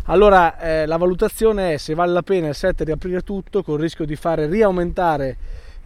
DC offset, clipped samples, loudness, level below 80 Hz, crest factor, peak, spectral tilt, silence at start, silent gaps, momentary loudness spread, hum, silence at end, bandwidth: under 0.1%; under 0.1%; -19 LUFS; -32 dBFS; 18 dB; 0 dBFS; -6.5 dB/octave; 0 s; none; 10 LU; none; 0.05 s; 14.5 kHz